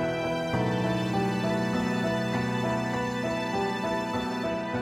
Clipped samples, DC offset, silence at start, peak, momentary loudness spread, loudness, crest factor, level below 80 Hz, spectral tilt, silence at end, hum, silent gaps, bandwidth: under 0.1%; under 0.1%; 0 s; -14 dBFS; 2 LU; -28 LUFS; 14 dB; -52 dBFS; -6 dB/octave; 0 s; none; none; 16 kHz